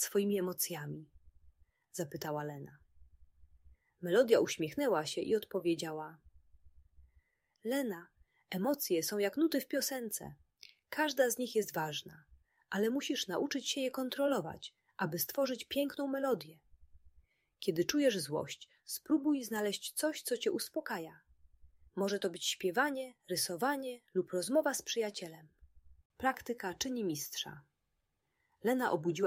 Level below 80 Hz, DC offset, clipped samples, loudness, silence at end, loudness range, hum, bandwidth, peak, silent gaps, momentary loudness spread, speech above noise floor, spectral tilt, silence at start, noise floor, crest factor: -72 dBFS; under 0.1%; under 0.1%; -36 LUFS; 0 s; 5 LU; none; 16 kHz; -14 dBFS; 26.05-26.10 s; 12 LU; 48 dB; -3.5 dB/octave; 0 s; -83 dBFS; 22 dB